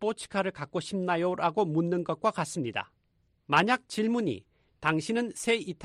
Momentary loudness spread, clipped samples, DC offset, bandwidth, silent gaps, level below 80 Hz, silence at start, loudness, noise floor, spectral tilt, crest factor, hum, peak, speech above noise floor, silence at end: 8 LU; under 0.1%; under 0.1%; 13 kHz; none; -68 dBFS; 0 s; -29 LUFS; -71 dBFS; -5 dB/octave; 20 dB; none; -10 dBFS; 42 dB; 0 s